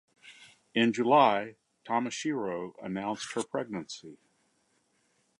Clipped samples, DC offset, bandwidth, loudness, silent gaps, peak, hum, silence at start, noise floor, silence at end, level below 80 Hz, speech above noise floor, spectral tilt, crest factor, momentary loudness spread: under 0.1%; under 0.1%; 11.5 kHz; -30 LUFS; none; -8 dBFS; none; 0.25 s; -72 dBFS; 1.25 s; -76 dBFS; 43 dB; -4.5 dB/octave; 22 dB; 16 LU